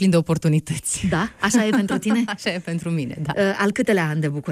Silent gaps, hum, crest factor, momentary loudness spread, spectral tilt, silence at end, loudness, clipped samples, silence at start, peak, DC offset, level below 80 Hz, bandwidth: none; none; 14 dB; 7 LU; -5.5 dB/octave; 0 s; -21 LUFS; under 0.1%; 0 s; -6 dBFS; under 0.1%; -50 dBFS; 15 kHz